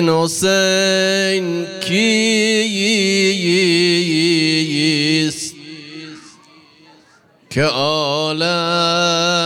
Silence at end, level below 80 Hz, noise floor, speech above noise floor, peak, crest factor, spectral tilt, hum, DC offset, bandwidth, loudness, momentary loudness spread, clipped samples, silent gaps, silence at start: 0 s; -62 dBFS; -51 dBFS; 36 dB; -4 dBFS; 12 dB; -3.5 dB/octave; none; under 0.1%; 16.5 kHz; -15 LUFS; 11 LU; under 0.1%; none; 0 s